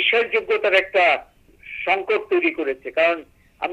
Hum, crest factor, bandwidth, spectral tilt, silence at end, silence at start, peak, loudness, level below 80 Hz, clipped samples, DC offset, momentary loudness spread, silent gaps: none; 16 dB; 10.5 kHz; -3.5 dB/octave; 0 s; 0 s; -4 dBFS; -20 LUFS; -58 dBFS; under 0.1%; under 0.1%; 11 LU; none